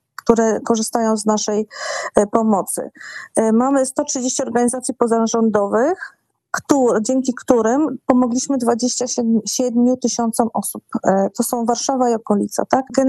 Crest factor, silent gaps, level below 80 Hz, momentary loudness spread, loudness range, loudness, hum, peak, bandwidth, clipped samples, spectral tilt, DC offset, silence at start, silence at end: 16 dB; none; -56 dBFS; 7 LU; 1 LU; -18 LUFS; none; 0 dBFS; 13 kHz; under 0.1%; -4 dB/octave; under 0.1%; 0.25 s; 0 s